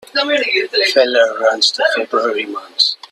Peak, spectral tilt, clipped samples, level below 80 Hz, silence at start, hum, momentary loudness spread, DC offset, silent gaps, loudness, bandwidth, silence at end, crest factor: 0 dBFS; -0.5 dB/octave; under 0.1%; -68 dBFS; 0.15 s; none; 5 LU; under 0.1%; none; -14 LUFS; 13 kHz; 0.15 s; 16 dB